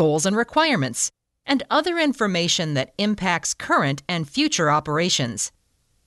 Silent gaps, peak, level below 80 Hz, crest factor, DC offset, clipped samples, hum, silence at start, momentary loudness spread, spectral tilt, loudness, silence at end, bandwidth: none; -4 dBFS; -56 dBFS; 18 dB; under 0.1%; under 0.1%; none; 0 s; 6 LU; -3.5 dB/octave; -21 LUFS; 0.6 s; 12 kHz